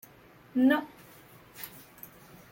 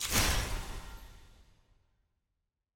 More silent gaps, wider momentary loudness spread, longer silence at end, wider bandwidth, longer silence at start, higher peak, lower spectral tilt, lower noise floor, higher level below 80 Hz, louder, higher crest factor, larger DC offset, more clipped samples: neither; first, 26 LU vs 23 LU; second, 0.85 s vs 1.45 s; about the same, 17 kHz vs 17 kHz; first, 0.55 s vs 0 s; first, -12 dBFS vs -16 dBFS; first, -5 dB/octave vs -2.5 dB/octave; second, -56 dBFS vs -85 dBFS; second, -70 dBFS vs -42 dBFS; first, -27 LUFS vs -33 LUFS; about the same, 20 dB vs 22 dB; neither; neither